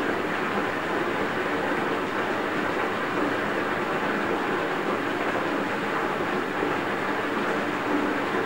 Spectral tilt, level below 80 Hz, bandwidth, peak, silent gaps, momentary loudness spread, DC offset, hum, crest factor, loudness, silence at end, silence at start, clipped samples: -5 dB/octave; -58 dBFS; 16 kHz; -12 dBFS; none; 1 LU; 0.4%; none; 14 dB; -26 LUFS; 0 s; 0 s; under 0.1%